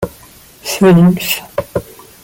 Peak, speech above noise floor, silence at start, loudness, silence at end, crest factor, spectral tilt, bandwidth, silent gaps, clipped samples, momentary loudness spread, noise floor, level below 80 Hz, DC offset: -2 dBFS; 29 dB; 0 s; -13 LUFS; 0.4 s; 12 dB; -6 dB/octave; 17 kHz; none; under 0.1%; 17 LU; -40 dBFS; -42 dBFS; under 0.1%